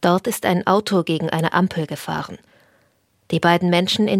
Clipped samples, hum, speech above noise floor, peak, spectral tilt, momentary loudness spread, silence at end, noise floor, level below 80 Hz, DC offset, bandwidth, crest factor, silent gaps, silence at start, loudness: under 0.1%; none; 43 dB; -2 dBFS; -5.5 dB/octave; 10 LU; 0 s; -62 dBFS; -62 dBFS; under 0.1%; 16 kHz; 18 dB; none; 0 s; -19 LUFS